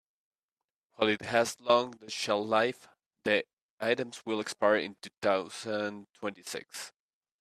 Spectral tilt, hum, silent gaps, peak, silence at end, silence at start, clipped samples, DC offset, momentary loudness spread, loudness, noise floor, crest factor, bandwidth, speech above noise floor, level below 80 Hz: -3.5 dB/octave; none; 3.53-3.78 s, 5.18-5.22 s; -10 dBFS; 0.5 s; 1 s; under 0.1%; under 0.1%; 13 LU; -31 LUFS; under -90 dBFS; 22 dB; 14 kHz; over 59 dB; -76 dBFS